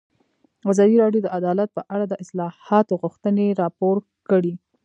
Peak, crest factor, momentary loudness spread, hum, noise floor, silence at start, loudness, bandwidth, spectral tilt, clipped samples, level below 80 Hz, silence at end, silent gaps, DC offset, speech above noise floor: -2 dBFS; 18 dB; 11 LU; none; -64 dBFS; 0.65 s; -21 LUFS; 9.4 kHz; -8 dB/octave; under 0.1%; -74 dBFS; 0.25 s; none; under 0.1%; 44 dB